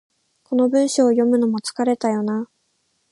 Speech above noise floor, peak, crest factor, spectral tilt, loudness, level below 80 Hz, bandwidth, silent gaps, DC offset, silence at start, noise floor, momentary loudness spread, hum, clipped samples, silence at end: 50 dB; -4 dBFS; 16 dB; -5 dB/octave; -19 LUFS; -74 dBFS; 11.5 kHz; none; under 0.1%; 0.5 s; -68 dBFS; 8 LU; none; under 0.1%; 0.65 s